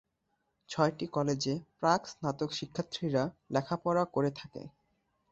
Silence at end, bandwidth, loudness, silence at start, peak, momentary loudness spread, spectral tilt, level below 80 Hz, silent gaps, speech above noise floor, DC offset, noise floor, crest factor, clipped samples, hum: 0.65 s; 8.2 kHz; -33 LUFS; 0.7 s; -12 dBFS; 11 LU; -5.5 dB/octave; -68 dBFS; none; 47 dB; under 0.1%; -80 dBFS; 22 dB; under 0.1%; none